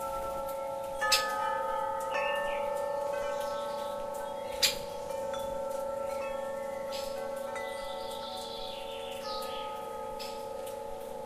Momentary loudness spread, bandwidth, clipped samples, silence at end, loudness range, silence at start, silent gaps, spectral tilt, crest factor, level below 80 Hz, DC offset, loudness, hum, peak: 11 LU; 15.5 kHz; under 0.1%; 0 s; 6 LU; 0 s; none; -1.5 dB/octave; 24 dB; -58 dBFS; under 0.1%; -34 LUFS; none; -10 dBFS